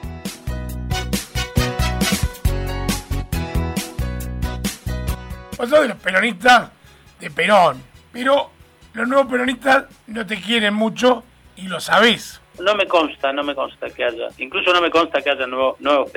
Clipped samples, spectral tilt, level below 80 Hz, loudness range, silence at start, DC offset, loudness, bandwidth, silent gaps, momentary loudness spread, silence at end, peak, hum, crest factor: under 0.1%; -4.5 dB/octave; -32 dBFS; 5 LU; 0 s; under 0.1%; -19 LUFS; 19.5 kHz; none; 14 LU; 0.05 s; -2 dBFS; none; 18 dB